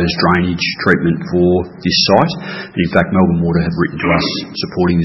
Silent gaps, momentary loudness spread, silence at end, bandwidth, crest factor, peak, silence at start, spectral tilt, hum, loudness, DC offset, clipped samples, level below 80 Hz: none; 7 LU; 0 s; 6 kHz; 14 dB; 0 dBFS; 0 s; -6.5 dB/octave; none; -14 LUFS; under 0.1%; under 0.1%; -42 dBFS